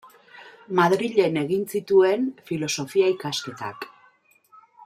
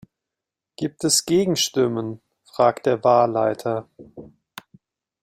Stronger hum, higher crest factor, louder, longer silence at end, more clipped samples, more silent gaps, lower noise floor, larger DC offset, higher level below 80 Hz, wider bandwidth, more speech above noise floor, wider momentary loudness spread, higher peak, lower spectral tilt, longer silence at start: neither; about the same, 20 dB vs 20 dB; second, -23 LUFS vs -20 LUFS; second, 0 s vs 0.95 s; neither; neither; second, -59 dBFS vs -86 dBFS; neither; second, -70 dBFS vs -64 dBFS; about the same, 15 kHz vs 16 kHz; second, 37 dB vs 66 dB; about the same, 15 LU vs 15 LU; about the same, -4 dBFS vs -4 dBFS; about the same, -5 dB/octave vs -4 dB/octave; second, 0.35 s vs 0.8 s